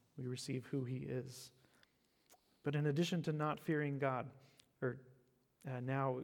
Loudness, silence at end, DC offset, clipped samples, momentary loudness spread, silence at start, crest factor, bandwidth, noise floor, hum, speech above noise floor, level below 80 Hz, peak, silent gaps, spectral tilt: -41 LUFS; 0 s; under 0.1%; under 0.1%; 15 LU; 0.15 s; 18 dB; 18 kHz; -75 dBFS; none; 35 dB; -80 dBFS; -24 dBFS; none; -6.5 dB/octave